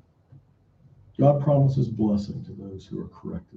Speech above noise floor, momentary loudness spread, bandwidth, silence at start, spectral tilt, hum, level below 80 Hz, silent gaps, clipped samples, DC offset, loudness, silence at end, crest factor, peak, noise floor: 34 dB; 18 LU; 7 kHz; 1.2 s; -10.5 dB/octave; none; -56 dBFS; none; under 0.1%; under 0.1%; -23 LUFS; 0.15 s; 18 dB; -6 dBFS; -58 dBFS